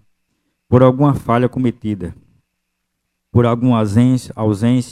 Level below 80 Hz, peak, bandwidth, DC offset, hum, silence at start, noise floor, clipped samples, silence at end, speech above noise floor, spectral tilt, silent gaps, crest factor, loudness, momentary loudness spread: -44 dBFS; 0 dBFS; 12.5 kHz; under 0.1%; none; 0.7 s; -73 dBFS; under 0.1%; 0 s; 59 dB; -8.5 dB/octave; none; 16 dB; -15 LUFS; 11 LU